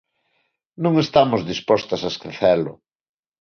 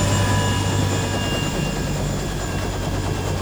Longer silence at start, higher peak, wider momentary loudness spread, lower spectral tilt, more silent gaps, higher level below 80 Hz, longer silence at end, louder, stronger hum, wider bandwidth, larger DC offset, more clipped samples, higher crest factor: first, 0.8 s vs 0 s; first, -2 dBFS vs -8 dBFS; about the same, 8 LU vs 6 LU; about the same, -6 dB/octave vs -5 dB/octave; neither; second, -56 dBFS vs -32 dBFS; first, 0.7 s vs 0 s; about the same, -20 LUFS vs -22 LUFS; neither; second, 6.8 kHz vs over 20 kHz; second, under 0.1% vs 0.3%; neither; first, 20 dB vs 14 dB